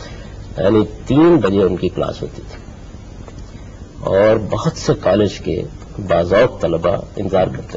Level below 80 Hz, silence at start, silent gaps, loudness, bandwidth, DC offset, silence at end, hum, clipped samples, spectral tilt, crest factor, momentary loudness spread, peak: -36 dBFS; 0 s; none; -16 LUFS; 7.8 kHz; under 0.1%; 0 s; none; under 0.1%; -7 dB/octave; 14 dB; 22 LU; -2 dBFS